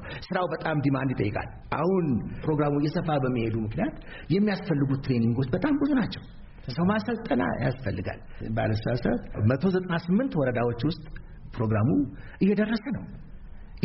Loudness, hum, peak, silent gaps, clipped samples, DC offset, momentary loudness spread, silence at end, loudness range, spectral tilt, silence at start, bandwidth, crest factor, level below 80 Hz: -27 LUFS; none; -12 dBFS; none; under 0.1%; under 0.1%; 10 LU; 0 s; 2 LU; -7 dB/octave; 0 s; 5.8 kHz; 16 dB; -44 dBFS